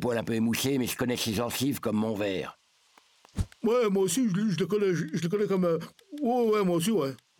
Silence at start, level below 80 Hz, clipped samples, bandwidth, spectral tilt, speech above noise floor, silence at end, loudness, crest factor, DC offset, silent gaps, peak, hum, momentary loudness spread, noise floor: 0 s; -52 dBFS; under 0.1%; 19.5 kHz; -5 dB/octave; 36 dB; 0.25 s; -28 LUFS; 16 dB; under 0.1%; none; -12 dBFS; none; 8 LU; -63 dBFS